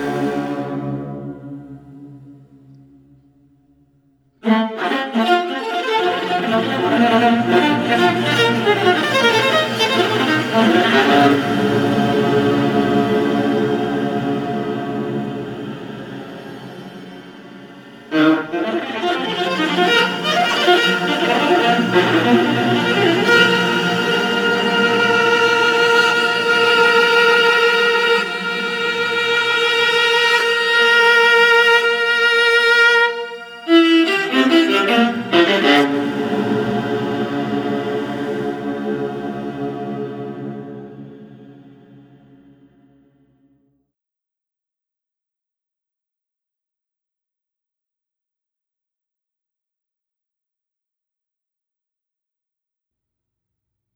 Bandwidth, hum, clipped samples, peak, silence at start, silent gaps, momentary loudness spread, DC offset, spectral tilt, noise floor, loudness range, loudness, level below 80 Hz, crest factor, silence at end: over 20 kHz; none; under 0.1%; -2 dBFS; 0 s; none; 15 LU; under 0.1%; -4.5 dB/octave; -87 dBFS; 14 LU; -15 LUFS; -60 dBFS; 16 dB; 12.45 s